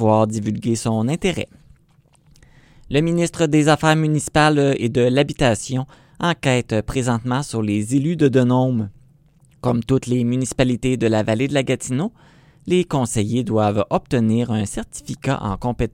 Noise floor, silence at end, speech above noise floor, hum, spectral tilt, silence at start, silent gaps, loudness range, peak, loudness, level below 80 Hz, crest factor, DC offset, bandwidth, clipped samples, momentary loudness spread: -56 dBFS; 0.05 s; 37 dB; none; -6 dB/octave; 0 s; none; 3 LU; 0 dBFS; -19 LUFS; -42 dBFS; 18 dB; under 0.1%; 15.5 kHz; under 0.1%; 9 LU